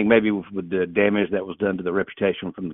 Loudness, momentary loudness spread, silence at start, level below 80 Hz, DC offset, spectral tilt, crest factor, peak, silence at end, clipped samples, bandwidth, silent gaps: -23 LUFS; 8 LU; 0 s; -58 dBFS; under 0.1%; -11 dB/octave; 20 dB; -2 dBFS; 0 s; under 0.1%; 3.9 kHz; none